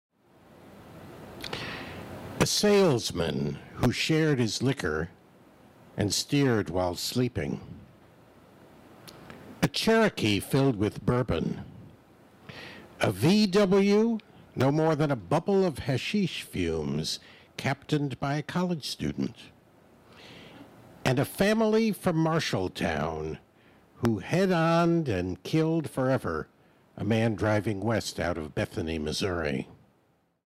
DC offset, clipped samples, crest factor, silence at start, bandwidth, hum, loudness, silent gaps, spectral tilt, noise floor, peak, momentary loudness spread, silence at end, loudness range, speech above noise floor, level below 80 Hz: under 0.1%; under 0.1%; 16 dB; 0.65 s; 16 kHz; none; -27 LUFS; none; -5.5 dB/octave; -68 dBFS; -12 dBFS; 18 LU; 0.75 s; 5 LU; 42 dB; -54 dBFS